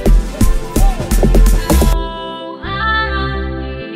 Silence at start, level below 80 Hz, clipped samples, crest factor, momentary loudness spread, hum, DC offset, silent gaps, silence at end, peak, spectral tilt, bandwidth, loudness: 0 s; -14 dBFS; under 0.1%; 12 dB; 11 LU; none; under 0.1%; none; 0 s; 0 dBFS; -5 dB/octave; 16 kHz; -16 LUFS